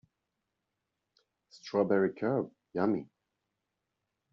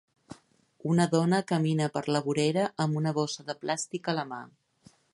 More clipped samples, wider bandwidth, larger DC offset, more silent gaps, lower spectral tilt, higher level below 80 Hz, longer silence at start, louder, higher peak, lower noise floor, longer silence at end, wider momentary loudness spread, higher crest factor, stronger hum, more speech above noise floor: neither; second, 7.4 kHz vs 11.5 kHz; neither; neither; about the same, -6.5 dB/octave vs -5.5 dB/octave; about the same, -76 dBFS vs -74 dBFS; first, 1.55 s vs 0.3 s; second, -32 LUFS vs -29 LUFS; second, -14 dBFS vs -10 dBFS; first, -85 dBFS vs -61 dBFS; first, 1.3 s vs 0.65 s; about the same, 9 LU vs 9 LU; about the same, 22 dB vs 20 dB; neither; first, 55 dB vs 33 dB